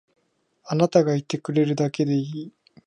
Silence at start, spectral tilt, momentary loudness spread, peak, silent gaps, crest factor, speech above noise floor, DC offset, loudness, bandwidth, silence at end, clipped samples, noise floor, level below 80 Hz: 0.65 s; -7 dB/octave; 14 LU; -4 dBFS; none; 20 dB; 45 dB; under 0.1%; -23 LUFS; 11 kHz; 0.35 s; under 0.1%; -67 dBFS; -70 dBFS